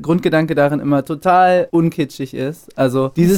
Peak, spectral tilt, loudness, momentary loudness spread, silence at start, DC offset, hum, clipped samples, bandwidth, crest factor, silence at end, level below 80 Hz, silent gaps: 0 dBFS; -7 dB/octave; -16 LUFS; 11 LU; 0 s; under 0.1%; none; under 0.1%; 17 kHz; 14 dB; 0 s; -50 dBFS; none